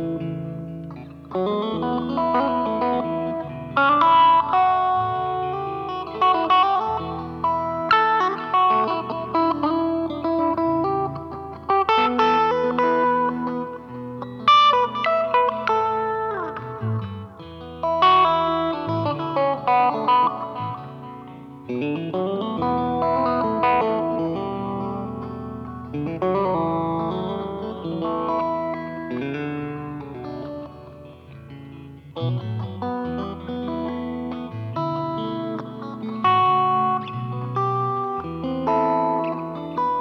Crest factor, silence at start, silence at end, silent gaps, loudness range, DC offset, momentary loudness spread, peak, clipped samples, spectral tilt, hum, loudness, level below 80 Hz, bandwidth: 18 dB; 0 s; 0 s; none; 9 LU; under 0.1%; 16 LU; -4 dBFS; under 0.1%; -7.5 dB/octave; none; -22 LUFS; -52 dBFS; 6.8 kHz